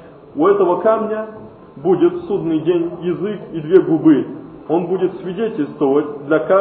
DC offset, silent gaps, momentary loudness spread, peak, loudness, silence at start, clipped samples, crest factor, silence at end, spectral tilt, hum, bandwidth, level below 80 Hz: under 0.1%; none; 12 LU; 0 dBFS; -17 LUFS; 0 s; under 0.1%; 16 dB; 0 s; -11.5 dB/octave; none; 3.9 kHz; -56 dBFS